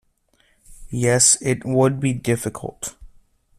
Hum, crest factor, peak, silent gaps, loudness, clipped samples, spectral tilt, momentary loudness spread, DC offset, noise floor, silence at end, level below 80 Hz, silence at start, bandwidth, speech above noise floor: none; 20 dB; -2 dBFS; none; -19 LUFS; under 0.1%; -4 dB/octave; 17 LU; under 0.1%; -62 dBFS; 0.55 s; -48 dBFS; 0.7 s; 14.5 kHz; 42 dB